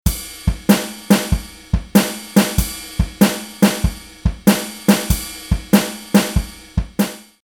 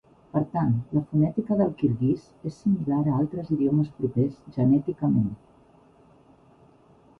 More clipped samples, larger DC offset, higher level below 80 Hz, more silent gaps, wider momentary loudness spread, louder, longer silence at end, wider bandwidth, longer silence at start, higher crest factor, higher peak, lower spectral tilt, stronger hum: neither; neither; first, -26 dBFS vs -56 dBFS; neither; about the same, 8 LU vs 6 LU; first, -18 LUFS vs -25 LUFS; second, 0.2 s vs 1.85 s; first, over 20 kHz vs 6.4 kHz; second, 0.05 s vs 0.35 s; about the same, 18 dB vs 16 dB; first, 0 dBFS vs -10 dBFS; second, -5 dB/octave vs -11 dB/octave; neither